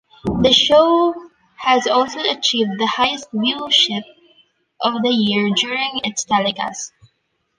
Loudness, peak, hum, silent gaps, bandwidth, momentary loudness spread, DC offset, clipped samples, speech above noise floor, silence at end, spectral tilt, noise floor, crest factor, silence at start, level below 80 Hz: -17 LUFS; 0 dBFS; none; none; 10.5 kHz; 12 LU; under 0.1%; under 0.1%; 51 dB; 0.7 s; -3.5 dB/octave; -68 dBFS; 18 dB; 0.25 s; -48 dBFS